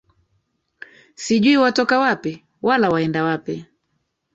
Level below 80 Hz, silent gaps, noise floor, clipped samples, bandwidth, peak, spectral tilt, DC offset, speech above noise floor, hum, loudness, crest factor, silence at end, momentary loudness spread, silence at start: -60 dBFS; none; -72 dBFS; under 0.1%; 8 kHz; -4 dBFS; -5 dB/octave; under 0.1%; 54 dB; none; -18 LUFS; 16 dB; 0.7 s; 15 LU; 1.2 s